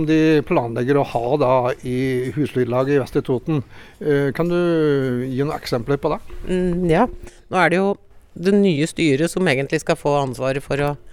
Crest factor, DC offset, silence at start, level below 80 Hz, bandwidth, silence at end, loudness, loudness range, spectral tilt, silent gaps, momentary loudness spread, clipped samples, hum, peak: 16 dB; under 0.1%; 0 s; -42 dBFS; 16 kHz; 0 s; -20 LUFS; 2 LU; -6.5 dB/octave; none; 7 LU; under 0.1%; none; -4 dBFS